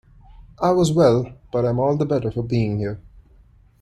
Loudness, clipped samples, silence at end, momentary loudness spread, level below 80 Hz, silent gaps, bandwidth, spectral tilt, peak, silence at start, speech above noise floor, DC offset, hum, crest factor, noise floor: -20 LUFS; under 0.1%; 0.6 s; 11 LU; -46 dBFS; none; 12 kHz; -7.5 dB/octave; -4 dBFS; 0.4 s; 33 dB; under 0.1%; none; 18 dB; -52 dBFS